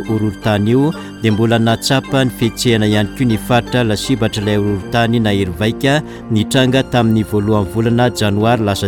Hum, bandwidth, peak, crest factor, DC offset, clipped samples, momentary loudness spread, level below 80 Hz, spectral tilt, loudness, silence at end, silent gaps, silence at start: none; 18 kHz; -2 dBFS; 12 dB; under 0.1%; under 0.1%; 4 LU; -38 dBFS; -6 dB/octave; -15 LUFS; 0 s; none; 0 s